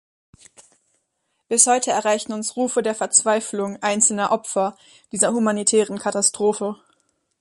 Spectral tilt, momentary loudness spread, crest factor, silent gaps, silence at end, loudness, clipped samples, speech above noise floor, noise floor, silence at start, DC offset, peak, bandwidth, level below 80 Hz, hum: -2.5 dB/octave; 11 LU; 22 dB; none; 0.65 s; -19 LUFS; under 0.1%; 53 dB; -73 dBFS; 1.5 s; under 0.1%; 0 dBFS; 11.5 kHz; -68 dBFS; none